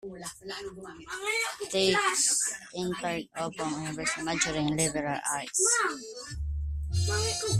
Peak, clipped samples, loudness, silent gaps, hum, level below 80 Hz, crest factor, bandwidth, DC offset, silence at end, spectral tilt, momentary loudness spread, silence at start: -10 dBFS; under 0.1%; -28 LUFS; none; none; -44 dBFS; 20 dB; 15 kHz; under 0.1%; 0 s; -3 dB/octave; 15 LU; 0.05 s